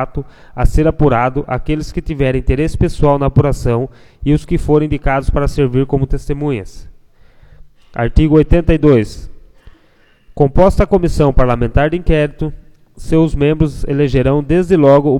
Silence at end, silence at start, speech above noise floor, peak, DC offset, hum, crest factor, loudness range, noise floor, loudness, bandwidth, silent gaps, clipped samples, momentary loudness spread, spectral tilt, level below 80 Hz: 0 s; 0 s; 37 dB; 0 dBFS; under 0.1%; none; 14 dB; 3 LU; -50 dBFS; -14 LUFS; 12 kHz; none; under 0.1%; 11 LU; -8 dB/octave; -20 dBFS